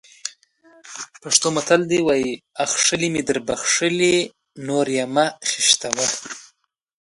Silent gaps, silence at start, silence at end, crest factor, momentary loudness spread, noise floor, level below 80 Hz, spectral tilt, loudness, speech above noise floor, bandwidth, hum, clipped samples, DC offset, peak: none; 0.25 s; 0.7 s; 22 dB; 16 LU; -62 dBFS; -58 dBFS; -2 dB/octave; -19 LUFS; 42 dB; 11.5 kHz; none; under 0.1%; under 0.1%; 0 dBFS